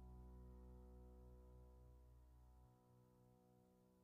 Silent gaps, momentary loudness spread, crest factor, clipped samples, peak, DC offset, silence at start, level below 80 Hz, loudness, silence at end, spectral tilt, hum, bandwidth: none; 6 LU; 12 dB; under 0.1%; -52 dBFS; under 0.1%; 0 s; -66 dBFS; -65 LUFS; 0 s; -9 dB/octave; none; 3.9 kHz